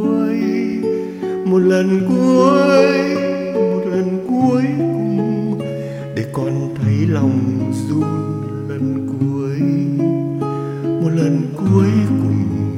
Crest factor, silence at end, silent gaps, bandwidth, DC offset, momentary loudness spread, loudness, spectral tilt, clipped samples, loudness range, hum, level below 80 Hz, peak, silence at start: 16 dB; 0 s; none; 12.5 kHz; under 0.1%; 9 LU; -17 LUFS; -8 dB/octave; under 0.1%; 5 LU; none; -54 dBFS; 0 dBFS; 0 s